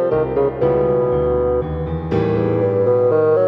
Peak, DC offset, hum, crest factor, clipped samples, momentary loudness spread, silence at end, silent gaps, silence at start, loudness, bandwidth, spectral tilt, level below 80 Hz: -6 dBFS; under 0.1%; none; 10 dB; under 0.1%; 6 LU; 0 s; none; 0 s; -17 LUFS; 5 kHz; -10.5 dB/octave; -34 dBFS